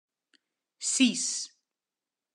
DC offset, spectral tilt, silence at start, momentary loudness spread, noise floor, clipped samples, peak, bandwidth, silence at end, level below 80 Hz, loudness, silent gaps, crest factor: under 0.1%; -1 dB/octave; 0.8 s; 11 LU; under -90 dBFS; under 0.1%; -10 dBFS; 12 kHz; 0.85 s; under -90 dBFS; -27 LUFS; none; 22 dB